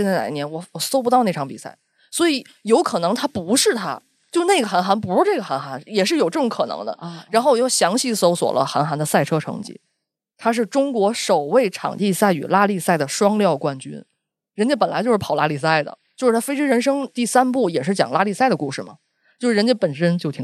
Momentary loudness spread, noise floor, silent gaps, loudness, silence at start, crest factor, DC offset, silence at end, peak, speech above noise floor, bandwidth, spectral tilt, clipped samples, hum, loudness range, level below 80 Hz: 11 LU; -77 dBFS; none; -19 LUFS; 0 s; 18 dB; under 0.1%; 0 s; -2 dBFS; 58 dB; 13.5 kHz; -4.5 dB/octave; under 0.1%; none; 2 LU; -68 dBFS